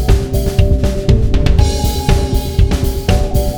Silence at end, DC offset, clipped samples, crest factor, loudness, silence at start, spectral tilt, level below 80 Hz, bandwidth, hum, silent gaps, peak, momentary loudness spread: 0 s; under 0.1%; 0.1%; 12 dB; -14 LUFS; 0 s; -6 dB/octave; -14 dBFS; over 20 kHz; none; none; 0 dBFS; 3 LU